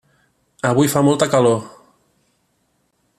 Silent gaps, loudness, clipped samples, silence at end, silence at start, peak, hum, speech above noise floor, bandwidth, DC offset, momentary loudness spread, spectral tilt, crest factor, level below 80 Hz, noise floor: none; -16 LUFS; under 0.1%; 1.5 s; 0.65 s; -2 dBFS; none; 50 dB; 14.5 kHz; under 0.1%; 8 LU; -5.5 dB/octave; 18 dB; -58 dBFS; -66 dBFS